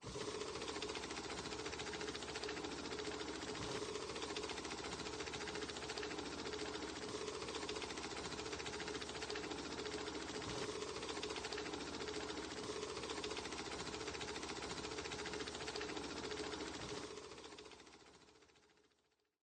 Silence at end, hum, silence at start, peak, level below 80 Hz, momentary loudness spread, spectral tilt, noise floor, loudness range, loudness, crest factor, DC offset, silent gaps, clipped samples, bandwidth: 0.7 s; none; 0 s; -28 dBFS; -66 dBFS; 2 LU; -3 dB/octave; -81 dBFS; 1 LU; -45 LUFS; 18 dB; under 0.1%; none; under 0.1%; 12.5 kHz